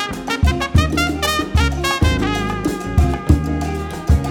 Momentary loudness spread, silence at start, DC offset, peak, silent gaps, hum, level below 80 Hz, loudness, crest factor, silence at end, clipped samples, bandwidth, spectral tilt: 6 LU; 0 s; under 0.1%; 0 dBFS; none; none; -24 dBFS; -18 LUFS; 18 dB; 0 s; under 0.1%; 17.5 kHz; -5.5 dB/octave